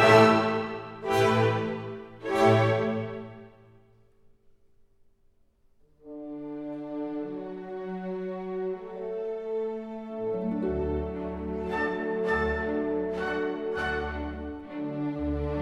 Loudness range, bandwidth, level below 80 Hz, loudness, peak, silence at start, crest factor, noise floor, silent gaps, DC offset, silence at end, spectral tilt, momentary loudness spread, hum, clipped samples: 13 LU; 14 kHz; -46 dBFS; -29 LUFS; -6 dBFS; 0 s; 22 dB; -63 dBFS; none; under 0.1%; 0 s; -6.5 dB/octave; 15 LU; none; under 0.1%